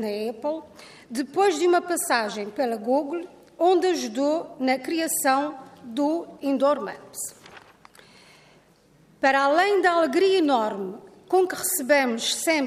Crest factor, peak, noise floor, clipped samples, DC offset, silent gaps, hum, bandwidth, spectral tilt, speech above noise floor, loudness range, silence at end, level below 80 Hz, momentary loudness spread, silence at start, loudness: 16 dB; -8 dBFS; -58 dBFS; under 0.1%; under 0.1%; none; none; 15.5 kHz; -2.5 dB/octave; 34 dB; 6 LU; 0 s; -70 dBFS; 14 LU; 0 s; -23 LUFS